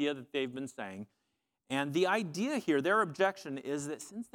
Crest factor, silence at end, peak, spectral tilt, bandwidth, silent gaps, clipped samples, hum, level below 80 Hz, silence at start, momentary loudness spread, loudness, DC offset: 20 dB; 0.1 s; -14 dBFS; -4.5 dB/octave; 17 kHz; none; under 0.1%; none; -82 dBFS; 0 s; 14 LU; -33 LUFS; under 0.1%